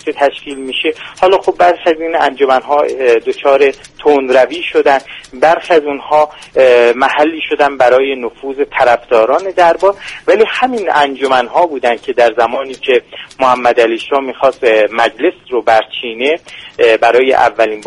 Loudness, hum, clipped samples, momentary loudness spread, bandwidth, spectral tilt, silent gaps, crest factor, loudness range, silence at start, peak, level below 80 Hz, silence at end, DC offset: -11 LUFS; none; 0.2%; 7 LU; 11.5 kHz; -3.5 dB/octave; none; 12 dB; 2 LU; 0.05 s; 0 dBFS; -50 dBFS; 0 s; under 0.1%